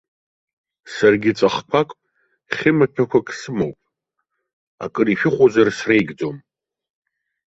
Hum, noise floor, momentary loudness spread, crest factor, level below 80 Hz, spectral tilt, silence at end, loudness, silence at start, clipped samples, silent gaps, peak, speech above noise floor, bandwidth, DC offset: none; -76 dBFS; 13 LU; 18 dB; -58 dBFS; -6 dB/octave; 1.1 s; -18 LUFS; 0.85 s; under 0.1%; 4.53-4.78 s; -2 dBFS; 59 dB; 8 kHz; under 0.1%